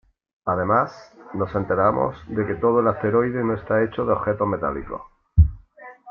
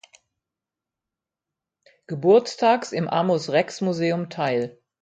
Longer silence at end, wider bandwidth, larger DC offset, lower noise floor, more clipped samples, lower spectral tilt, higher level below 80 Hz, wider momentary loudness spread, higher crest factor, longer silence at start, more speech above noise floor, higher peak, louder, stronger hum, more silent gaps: second, 0 s vs 0.3 s; second, 6 kHz vs 9.2 kHz; neither; second, -45 dBFS vs -88 dBFS; neither; first, -10 dB/octave vs -6 dB/octave; first, -34 dBFS vs -70 dBFS; first, 11 LU vs 8 LU; about the same, 20 dB vs 20 dB; second, 0.45 s vs 2.1 s; second, 23 dB vs 66 dB; about the same, -4 dBFS vs -4 dBFS; about the same, -22 LUFS vs -22 LUFS; neither; neither